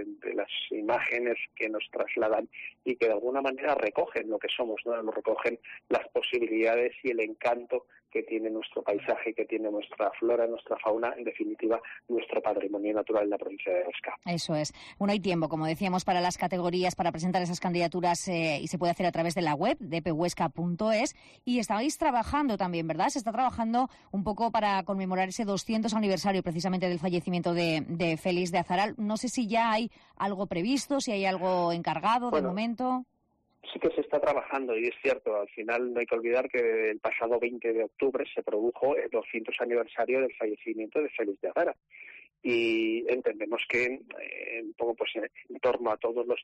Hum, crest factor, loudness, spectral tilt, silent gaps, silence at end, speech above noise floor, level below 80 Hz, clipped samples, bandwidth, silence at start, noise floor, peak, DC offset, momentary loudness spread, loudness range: none; 14 dB; -30 LUFS; -5 dB/octave; none; 0 s; 43 dB; -62 dBFS; under 0.1%; 13 kHz; 0 s; -73 dBFS; -16 dBFS; under 0.1%; 6 LU; 2 LU